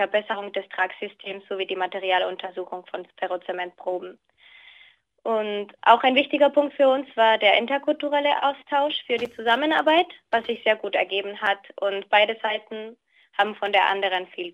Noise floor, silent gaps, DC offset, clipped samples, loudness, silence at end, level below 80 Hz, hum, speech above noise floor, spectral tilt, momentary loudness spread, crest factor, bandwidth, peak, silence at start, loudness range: -55 dBFS; none; under 0.1%; under 0.1%; -23 LUFS; 0.05 s; -76 dBFS; none; 32 dB; -4.5 dB/octave; 14 LU; 22 dB; 9.2 kHz; -2 dBFS; 0 s; 9 LU